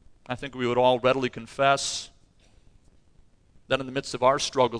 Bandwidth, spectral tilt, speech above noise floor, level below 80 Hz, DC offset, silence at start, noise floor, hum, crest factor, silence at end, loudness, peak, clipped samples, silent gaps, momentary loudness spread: 10.5 kHz; -4 dB/octave; 33 dB; -56 dBFS; under 0.1%; 0.3 s; -57 dBFS; none; 20 dB; 0 s; -25 LUFS; -8 dBFS; under 0.1%; none; 13 LU